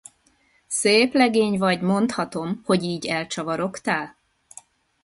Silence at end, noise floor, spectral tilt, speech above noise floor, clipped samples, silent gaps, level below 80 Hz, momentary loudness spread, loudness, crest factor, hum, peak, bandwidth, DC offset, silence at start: 0.95 s; -62 dBFS; -4.5 dB/octave; 41 dB; under 0.1%; none; -62 dBFS; 10 LU; -22 LUFS; 20 dB; none; -4 dBFS; 11.5 kHz; under 0.1%; 0.7 s